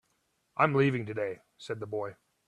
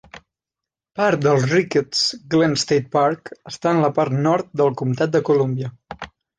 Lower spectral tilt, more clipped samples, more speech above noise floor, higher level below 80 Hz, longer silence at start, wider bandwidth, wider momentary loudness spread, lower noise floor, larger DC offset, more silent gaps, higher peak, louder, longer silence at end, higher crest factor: first, -7.5 dB/octave vs -5.5 dB/octave; neither; second, 45 dB vs 68 dB; second, -70 dBFS vs -58 dBFS; first, 0.55 s vs 0.15 s; about the same, 10.5 kHz vs 9.8 kHz; about the same, 16 LU vs 14 LU; second, -75 dBFS vs -87 dBFS; neither; neither; second, -8 dBFS vs -4 dBFS; second, -31 LUFS vs -19 LUFS; about the same, 0.35 s vs 0.3 s; first, 24 dB vs 16 dB